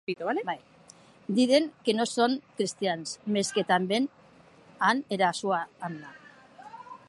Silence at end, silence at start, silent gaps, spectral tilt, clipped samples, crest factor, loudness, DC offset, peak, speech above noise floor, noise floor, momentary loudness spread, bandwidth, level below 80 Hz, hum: 0.1 s; 0.1 s; none; -4 dB/octave; under 0.1%; 20 dB; -28 LUFS; under 0.1%; -10 dBFS; 28 dB; -56 dBFS; 16 LU; 11.5 kHz; -78 dBFS; none